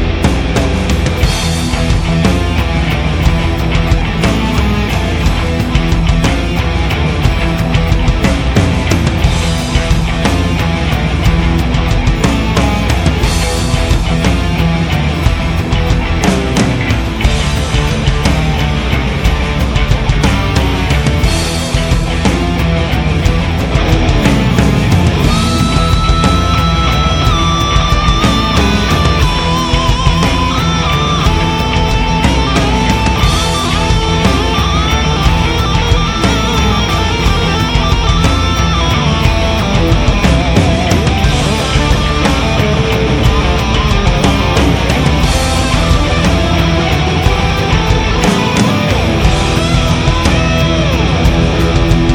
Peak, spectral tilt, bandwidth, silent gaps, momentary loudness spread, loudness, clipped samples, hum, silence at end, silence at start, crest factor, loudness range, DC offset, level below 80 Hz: 0 dBFS; -5.5 dB/octave; 17 kHz; none; 3 LU; -12 LUFS; 0.2%; none; 0 s; 0 s; 10 dB; 2 LU; under 0.1%; -16 dBFS